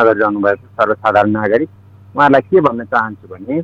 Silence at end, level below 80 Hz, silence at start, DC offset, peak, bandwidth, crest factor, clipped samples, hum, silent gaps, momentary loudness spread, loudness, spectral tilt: 0 s; -54 dBFS; 0 s; under 0.1%; 0 dBFS; 7.6 kHz; 14 dB; under 0.1%; none; none; 12 LU; -14 LUFS; -8 dB/octave